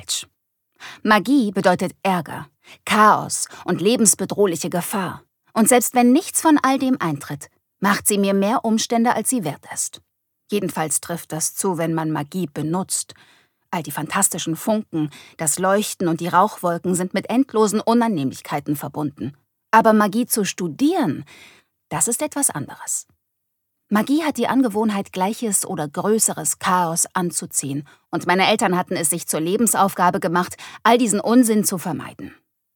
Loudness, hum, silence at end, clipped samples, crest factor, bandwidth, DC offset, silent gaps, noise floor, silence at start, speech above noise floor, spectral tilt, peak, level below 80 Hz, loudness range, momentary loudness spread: -20 LUFS; none; 0.45 s; under 0.1%; 20 dB; 19 kHz; under 0.1%; none; -76 dBFS; 0 s; 56 dB; -4 dB/octave; -2 dBFS; -66 dBFS; 5 LU; 12 LU